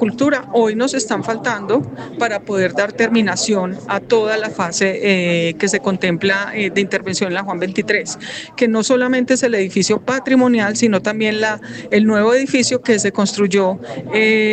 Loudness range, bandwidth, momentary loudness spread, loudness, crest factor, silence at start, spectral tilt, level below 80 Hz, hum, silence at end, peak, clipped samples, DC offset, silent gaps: 2 LU; 9.2 kHz; 6 LU; -16 LUFS; 16 dB; 0 s; -4 dB/octave; -58 dBFS; none; 0 s; 0 dBFS; under 0.1%; under 0.1%; none